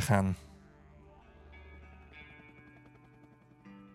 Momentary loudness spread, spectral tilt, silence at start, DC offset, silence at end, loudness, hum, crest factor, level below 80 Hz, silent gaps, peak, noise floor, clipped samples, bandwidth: 25 LU; -6 dB/octave; 0 s; under 0.1%; 0.15 s; -32 LUFS; none; 26 dB; -60 dBFS; none; -12 dBFS; -60 dBFS; under 0.1%; 16 kHz